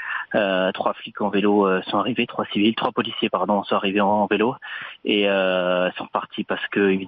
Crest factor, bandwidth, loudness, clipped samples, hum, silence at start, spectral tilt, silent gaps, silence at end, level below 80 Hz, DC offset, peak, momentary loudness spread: 18 dB; 4.9 kHz; -22 LUFS; under 0.1%; none; 0 s; -3 dB/octave; none; 0 s; -66 dBFS; under 0.1%; -4 dBFS; 8 LU